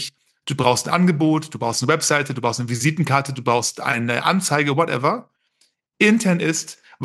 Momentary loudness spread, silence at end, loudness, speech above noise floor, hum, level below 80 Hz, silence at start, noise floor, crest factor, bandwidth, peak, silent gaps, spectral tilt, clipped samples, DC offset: 7 LU; 0 s; -19 LUFS; 45 dB; none; -66 dBFS; 0 s; -65 dBFS; 18 dB; 12.5 kHz; -2 dBFS; none; -4.5 dB/octave; under 0.1%; under 0.1%